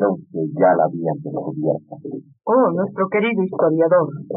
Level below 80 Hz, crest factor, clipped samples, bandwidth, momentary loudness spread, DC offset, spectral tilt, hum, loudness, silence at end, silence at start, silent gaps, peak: -74 dBFS; 14 dB; under 0.1%; 3.7 kHz; 11 LU; under 0.1%; -6.5 dB/octave; none; -19 LUFS; 0 s; 0 s; none; -4 dBFS